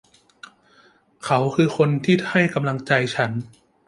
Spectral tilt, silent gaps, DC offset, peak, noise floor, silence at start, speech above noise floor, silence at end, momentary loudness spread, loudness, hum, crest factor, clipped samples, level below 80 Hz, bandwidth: -6.5 dB/octave; none; under 0.1%; -2 dBFS; -56 dBFS; 1.25 s; 36 dB; 0.4 s; 7 LU; -20 LUFS; none; 20 dB; under 0.1%; -62 dBFS; 11.5 kHz